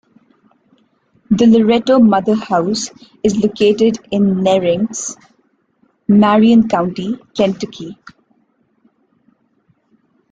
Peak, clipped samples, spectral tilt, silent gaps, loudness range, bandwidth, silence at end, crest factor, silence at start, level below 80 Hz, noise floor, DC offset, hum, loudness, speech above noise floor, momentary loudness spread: -2 dBFS; under 0.1%; -6 dB/octave; none; 8 LU; 9 kHz; 2.4 s; 14 dB; 1.3 s; -52 dBFS; -60 dBFS; under 0.1%; none; -14 LUFS; 47 dB; 15 LU